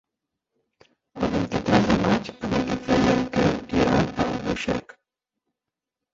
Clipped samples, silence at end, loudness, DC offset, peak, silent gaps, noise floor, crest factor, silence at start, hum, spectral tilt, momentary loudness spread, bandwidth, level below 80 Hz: under 0.1%; 1.35 s; -23 LUFS; under 0.1%; -4 dBFS; none; -87 dBFS; 20 dB; 1.15 s; none; -6 dB/octave; 7 LU; 7.8 kHz; -44 dBFS